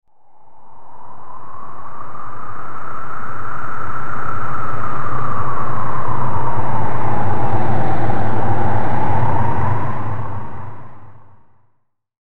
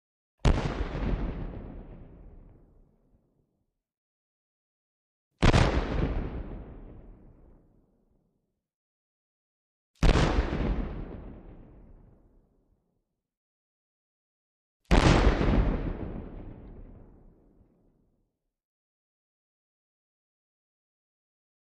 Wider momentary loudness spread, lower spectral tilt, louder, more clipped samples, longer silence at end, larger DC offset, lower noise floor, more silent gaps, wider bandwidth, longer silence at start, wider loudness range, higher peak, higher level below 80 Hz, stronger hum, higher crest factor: second, 17 LU vs 25 LU; first, -9 dB/octave vs -6.5 dB/octave; first, -23 LUFS vs -28 LUFS; neither; second, 0.1 s vs 4.65 s; first, 30% vs under 0.1%; second, -63 dBFS vs -80 dBFS; second, none vs 3.97-5.31 s, 8.74-9.94 s, 13.37-14.80 s; second, 9.4 kHz vs 10.5 kHz; second, 0 s vs 0.45 s; second, 10 LU vs 16 LU; first, -2 dBFS vs -6 dBFS; second, -40 dBFS vs -34 dBFS; neither; second, 10 dB vs 26 dB